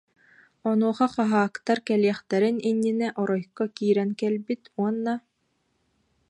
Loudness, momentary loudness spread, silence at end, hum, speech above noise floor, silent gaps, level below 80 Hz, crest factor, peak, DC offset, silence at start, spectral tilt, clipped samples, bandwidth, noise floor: -25 LUFS; 7 LU; 1.1 s; none; 48 dB; none; -74 dBFS; 18 dB; -8 dBFS; under 0.1%; 0.65 s; -7 dB/octave; under 0.1%; 10.5 kHz; -73 dBFS